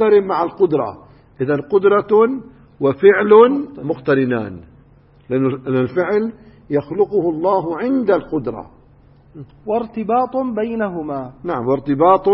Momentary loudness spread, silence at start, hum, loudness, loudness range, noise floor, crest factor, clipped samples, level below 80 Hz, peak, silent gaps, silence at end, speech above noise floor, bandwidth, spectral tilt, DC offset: 12 LU; 0 s; none; -17 LUFS; 7 LU; -48 dBFS; 16 dB; under 0.1%; -52 dBFS; 0 dBFS; none; 0 s; 32 dB; 5.6 kHz; -12 dB/octave; under 0.1%